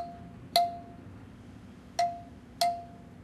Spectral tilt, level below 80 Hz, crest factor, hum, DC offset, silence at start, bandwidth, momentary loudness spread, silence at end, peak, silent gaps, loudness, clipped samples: -3 dB/octave; -60 dBFS; 26 dB; none; under 0.1%; 0 s; 14.5 kHz; 21 LU; 0 s; -8 dBFS; none; -32 LUFS; under 0.1%